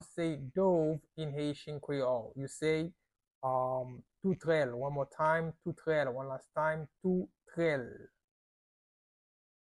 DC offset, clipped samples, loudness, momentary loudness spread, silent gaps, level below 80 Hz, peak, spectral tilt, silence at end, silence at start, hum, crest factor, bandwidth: under 0.1%; under 0.1%; -35 LUFS; 9 LU; 3.35-3.41 s; -68 dBFS; -18 dBFS; -7 dB/octave; 1.6 s; 0 s; none; 18 dB; 12 kHz